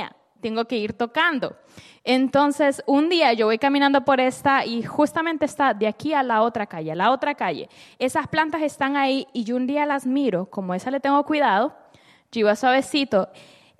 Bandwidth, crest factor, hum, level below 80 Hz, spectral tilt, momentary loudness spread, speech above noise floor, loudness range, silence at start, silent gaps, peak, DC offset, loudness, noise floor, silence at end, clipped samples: 13.5 kHz; 16 dB; none; -64 dBFS; -4.5 dB/octave; 9 LU; 33 dB; 4 LU; 0 s; none; -6 dBFS; under 0.1%; -21 LUFS; -54 dBFS; 0.55 s; under 0.1%